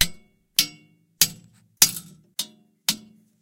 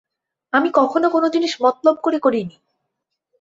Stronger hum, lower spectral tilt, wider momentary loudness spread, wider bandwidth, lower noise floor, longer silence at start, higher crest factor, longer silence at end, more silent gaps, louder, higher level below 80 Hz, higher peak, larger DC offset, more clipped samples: neither; second, 0.5 dB/octave vs -5 dB/octave; first, 15 LU vs 4 LU; first, 17 kHz vs 7.8 kHz; second, -54 dBFS vs -78 dBFS; second, 0 s vs 0.55 s; first, 26 dB vs 18 dB; second, 0.45 s vs 0.9 s; neither; second, -22 LUFS vs -18 LUFS; first, -54 dBFS vs -66 dBFS; about the same, 0 dBFS vs -2 dBFS; neither; neither